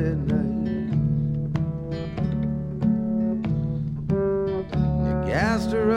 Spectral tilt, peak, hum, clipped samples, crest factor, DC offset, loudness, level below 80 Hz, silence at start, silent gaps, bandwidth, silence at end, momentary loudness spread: -8.5 dB/octave; -8 dBFS; none; under 0.1%; 14 dB; under 0.1%; -25 LUFS; -38 dBFS; 0 s; none; 9.4 kHz; 0 s; 5 LU